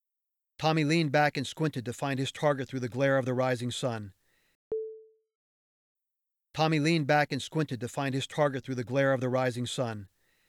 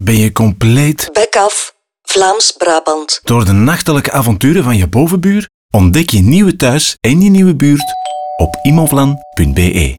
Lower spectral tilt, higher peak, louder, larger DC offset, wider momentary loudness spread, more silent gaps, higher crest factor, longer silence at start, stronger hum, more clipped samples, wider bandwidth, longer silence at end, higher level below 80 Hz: about the same, -5.5 dB/octave vs -5 dB/octave; second, -14 dBFS vs 0 dBFS; second, -29 LUFS vs -10 LUFS; neither; first, 11 LU vs 7 LU; first, 4.55-4.71 s, 5.35-5.95 s vs 5.54-5.69 s; first, 18 dB vs 10 dB; first, 0.6 s vs 0 s; neither; neither; second, 14 kHz vs 20 kHz; first, 0.45 s vs 0 s; second, -72 dBFS vs -28 dBFS